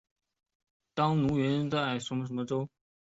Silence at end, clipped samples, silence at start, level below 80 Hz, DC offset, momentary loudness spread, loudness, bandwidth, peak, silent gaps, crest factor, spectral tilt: 0.4 s; under 0.1%; 0.95 s; -62 dBFS; under 0.1%; 8 LU; -31 LUFS; 8 kHz; -14 dBFS; none; 18 dB; -6.5 dB/octave